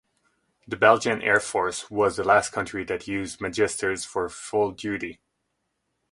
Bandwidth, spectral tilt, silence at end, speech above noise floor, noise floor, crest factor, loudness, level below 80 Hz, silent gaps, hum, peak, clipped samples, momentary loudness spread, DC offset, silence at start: 11.5 kHz; -3.5 dB/octave; 1 s; 53 dB; -77 dBFS; 22 dB; -24 LUFS; -56 dBFS; none; none; -4 dBFS; under 0.1%; 11 LU; under 0.1%; 0.7 s